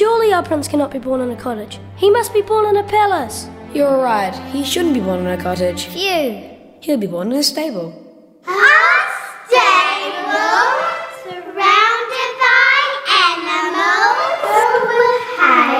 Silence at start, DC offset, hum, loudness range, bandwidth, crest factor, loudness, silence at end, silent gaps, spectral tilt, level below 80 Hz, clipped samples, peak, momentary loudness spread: 0 s; under 0.1%; none; 6 LU; 16 kHz; 16 dB; -14 LUFS; 0 s; none; -3 dB/octave; -52 dBFS; under 0.1%; 0 dBFS; 14 LU